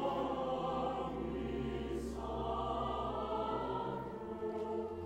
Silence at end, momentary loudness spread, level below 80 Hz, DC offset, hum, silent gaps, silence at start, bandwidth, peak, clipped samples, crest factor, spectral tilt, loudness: 0 s; 4 LU; -52 dBFS; under 0.1%; none; none; 0 s; 15.5 kHz; -26 dBFS; under 0.1%; 14 dB; -7 dB/octave; -39 LUFS